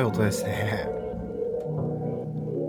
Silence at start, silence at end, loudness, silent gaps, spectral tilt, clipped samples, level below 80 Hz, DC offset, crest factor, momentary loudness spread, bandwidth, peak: 0 s; 0 s; -29 LUFS; none; -6.5 dB/octave; under 0.1%; -48 dBFS; under 0.1%; 18 dB; 6 LU; 19 kHz; -10 dBFS